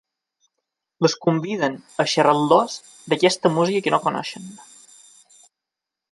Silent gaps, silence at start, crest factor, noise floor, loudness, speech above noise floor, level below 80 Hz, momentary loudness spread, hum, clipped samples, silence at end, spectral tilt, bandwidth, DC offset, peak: none; 1 s; 20 dB; -86 dBFS; -20 LUFS; 65 dB; -70 dBFS; 13 LU; none; under 0.1%; 1.5 s; -4.5 dB/octave; 11.5 kHz; under 0.1%; -2 dBFS